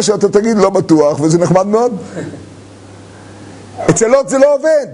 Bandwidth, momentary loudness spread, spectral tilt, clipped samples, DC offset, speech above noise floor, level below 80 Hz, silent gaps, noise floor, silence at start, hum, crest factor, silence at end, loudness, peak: 11 kHz; 16 LU; -5.5 dB/octave; under 0.1%; under 0.1%; 24 dB; -46 dBFS; none; -35 dBFS; 0 s; none; 12 dB; 0 s; -11 LUFS; 0 dBFS